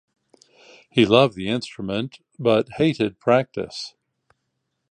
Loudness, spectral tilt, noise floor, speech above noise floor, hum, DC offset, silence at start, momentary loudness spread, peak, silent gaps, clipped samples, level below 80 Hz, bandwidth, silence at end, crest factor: -21 LUFS; -6 dB/octave; -76 dBFS; 55 dB; none; under 0.1%; 0.95 s; 15 LU; -2 dBFS; none; under 0.1%; -58 dBFS; 10 kHz; 1.05 s; 22 dB